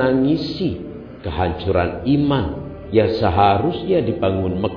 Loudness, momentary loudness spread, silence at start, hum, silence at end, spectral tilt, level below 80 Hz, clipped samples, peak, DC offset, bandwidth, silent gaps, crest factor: -19 LUFS; 12 LU; 0 s; none; 0 s; -9 dB/octave; -38 dBFS; under 0.1%; -2 dBFS; under 0.1%; 5.4 kHz; none; 16 dB